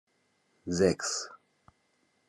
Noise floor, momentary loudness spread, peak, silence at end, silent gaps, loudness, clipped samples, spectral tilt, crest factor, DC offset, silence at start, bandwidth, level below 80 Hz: -73 dBFS; 18 LU; -10 dBFS; 0.95 s; none; -30 LUFS; under 0.1%; -4 dB/octave; 24 dB; under 0.1%; 0.65 s; 12.5 kHz; -68 dBFS